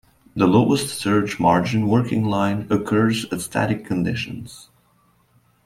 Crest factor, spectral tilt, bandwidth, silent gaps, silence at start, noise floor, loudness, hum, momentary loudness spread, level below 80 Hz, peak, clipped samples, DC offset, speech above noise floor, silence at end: 18 dB; -6 dB/octave; 16 kHz; none; 0.35 s; -60 dBFS; -20 LUFS; none; 9 LU; -52 dBFS; -2 dBFS; under 0.1%; under 0.1%; 40 dB; 1.05 s